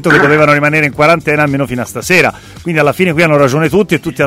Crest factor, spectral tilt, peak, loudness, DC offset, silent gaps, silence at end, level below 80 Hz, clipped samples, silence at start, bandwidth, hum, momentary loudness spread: 10 dB; -5.5 dB/octave; 0 dBFS; -10 LUFS; under 0.1%; none; 0 s; -40 dBFS; 0.1%; 0 s; 16.5 kHz; none; 8 LU